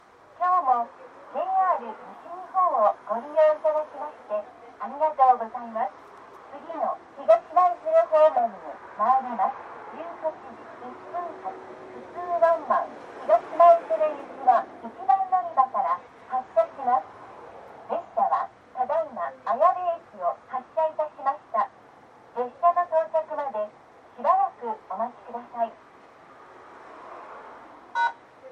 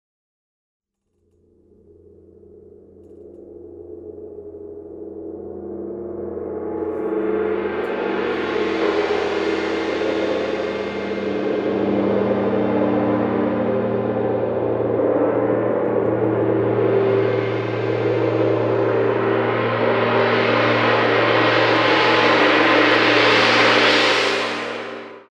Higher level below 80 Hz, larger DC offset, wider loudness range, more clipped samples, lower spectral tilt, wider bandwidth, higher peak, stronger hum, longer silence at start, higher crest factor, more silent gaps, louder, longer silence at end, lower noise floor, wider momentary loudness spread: second, -76 dBFS vs -56 dBFS; neither; second, 7 LU vs 16 LU; neither; about the same, -5.5 dB/octave vs -5.5 dB/octave; second, 6.6 kHz vs 9.8 kHz; second, -6 dBFS vs -2 dBFS; neither; second, 0.4 s vs 2.55 s; about the same, 20 dB vs 16 dB; neither; second, -25 LUFS vs -18 LUFS; about the same, 0 s vs 0.1 s; second, -51 dBFS vs -68 dBFS; about the same, 20 LU vs 18 LU